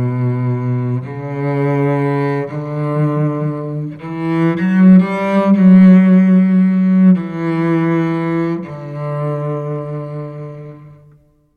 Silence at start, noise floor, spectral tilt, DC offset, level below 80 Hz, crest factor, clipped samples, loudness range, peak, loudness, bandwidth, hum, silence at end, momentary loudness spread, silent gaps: 0 s; -49 dBFS; -10.5 dB/octave; under 0.1%; -54 dBFS; 12 dB; under 0.1%; 9 LU; -2 dBFS; -14 LUFS; 4.6 kHz; none; 0.65 s; 16 LU; none